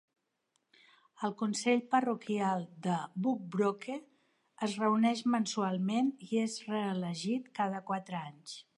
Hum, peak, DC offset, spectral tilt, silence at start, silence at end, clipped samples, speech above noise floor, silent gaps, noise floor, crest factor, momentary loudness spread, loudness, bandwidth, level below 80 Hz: none; -16 dBFS; under 0.1%; -5.5 dB/octave; 1.2 s; 0.15 s; under 0.1%; 47 dB; none; -80 dBFS; 18 dB; 10 LU; -34 LUFS; 11.5 kHz; -86 dBFS